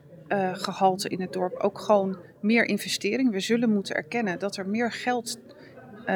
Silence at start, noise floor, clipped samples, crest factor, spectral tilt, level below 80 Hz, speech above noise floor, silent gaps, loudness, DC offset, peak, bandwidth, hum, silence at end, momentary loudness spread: 0.1 s; -46 dBFS; under 0.1%; 18 dB; -4.5 dB/octave; -76 dBFS; 20 dB; none; -26 LUFS; under 0.1%; -8 dBFS; 20 kHz; none; 0 s; 8 LU